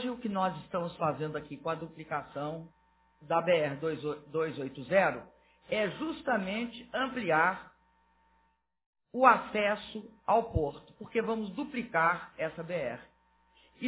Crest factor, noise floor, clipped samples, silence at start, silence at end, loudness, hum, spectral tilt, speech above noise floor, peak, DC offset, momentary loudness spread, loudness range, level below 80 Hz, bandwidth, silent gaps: 26 dB; -73 dBFS; under 0.1%; 0 s; 0 s; -32 LUFS; none; -4 dB/octave; 41 dB; -8 dBFS; under 0.1%; 12 LU; 4 LU; -56 dBFS; 4 kHz; 8.86-8.93 s